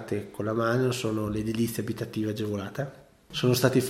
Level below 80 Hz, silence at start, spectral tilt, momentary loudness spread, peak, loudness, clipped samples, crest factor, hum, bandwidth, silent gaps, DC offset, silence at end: -56 dBFS; 0 s; -5.5 dB/octave; 10 LU; -8 dBFS; -29 LUFS; under 0.1%; 20 dB; none; 16.5 kHz; none; under 0.1%; 0 s